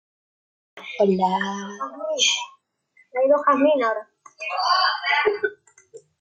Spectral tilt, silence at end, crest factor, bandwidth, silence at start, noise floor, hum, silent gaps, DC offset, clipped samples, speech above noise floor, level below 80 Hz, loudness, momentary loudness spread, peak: -3 dB/octave; 0.2 s; 16 dB; 9.4 kHz; 0.75 s; -61 dBFS; none; none; under 0.1%; under 0.1%; 39 dB; -72 dBFS; -21 LUFS; 14 LU; -8 dBFS